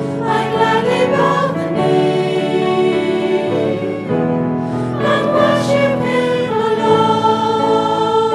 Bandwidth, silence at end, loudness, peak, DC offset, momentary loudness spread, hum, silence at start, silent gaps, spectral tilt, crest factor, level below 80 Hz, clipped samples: 12.5 kHz; 0 s; -15 LUFS; 0 dBFS; under 0.1%; 5 LU; none; 0 s; none; -6.5 dB/octave; 14 dB; -54 dBFS; under 0.1%